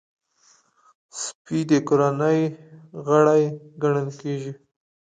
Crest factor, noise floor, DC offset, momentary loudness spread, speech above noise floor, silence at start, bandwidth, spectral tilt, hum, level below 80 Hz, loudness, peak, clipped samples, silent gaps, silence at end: 18 dB; -60 dBFS; under 0.1%; 15 LU; 39 dB; 1.15 s; 9.4 kHz; -6.5 dB/octave; none; -70 dBFS; -22 LUFS; -4 dBFS; under 0.1%; 1.35-1.45 s; 0.6 s